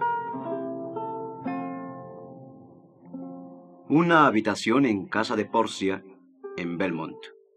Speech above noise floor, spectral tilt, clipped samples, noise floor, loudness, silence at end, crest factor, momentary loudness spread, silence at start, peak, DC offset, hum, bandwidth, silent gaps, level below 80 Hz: 27 dB; -5.5 dB/octave; under 0.1%; -51 dBFS; -26 LUFS; 0.25 s; 22 dB; 23 LU; 0 s; -6 dBFS; under 0.1%; none; 10.5 kHz; none; -78 dBFS